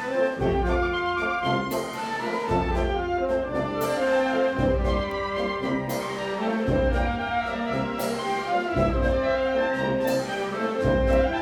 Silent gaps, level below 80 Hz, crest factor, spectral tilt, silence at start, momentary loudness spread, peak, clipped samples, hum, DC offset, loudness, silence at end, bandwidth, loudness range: none; -34 dBFS; 16 dB; -6 dB/octave; 0 s; 5 LU; -10 dBFS; under 0.1%; none; under 0.1%; -25 LUFS; 0 s; 19 kHz; 1 LU